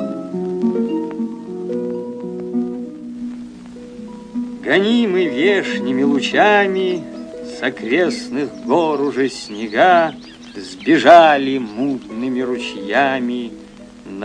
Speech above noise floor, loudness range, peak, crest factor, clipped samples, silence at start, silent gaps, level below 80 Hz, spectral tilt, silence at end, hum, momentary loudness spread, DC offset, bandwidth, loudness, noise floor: 23 dB; 9 LU; 0 dBFS; 18 dB; under 0.1%; 0 s; none; -56 dBFS; -5 dB/octave; 0 s; none; 19 LU; under 0.1%; 10 kHz; -17 LUFS; -38 dBFS